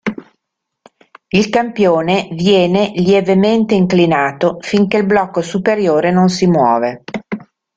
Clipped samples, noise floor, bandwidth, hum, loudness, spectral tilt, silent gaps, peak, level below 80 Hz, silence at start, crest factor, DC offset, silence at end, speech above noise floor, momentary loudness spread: under 0.1%; -76 dBFS; 7.8 kHz; none; -13 LUFS; -6.5 dB/octave; none; -2 dBFS; -52 dBFS; 0.05 s; 12 dB; under 0.1%; 0.35 s; 63 dB; 11 LU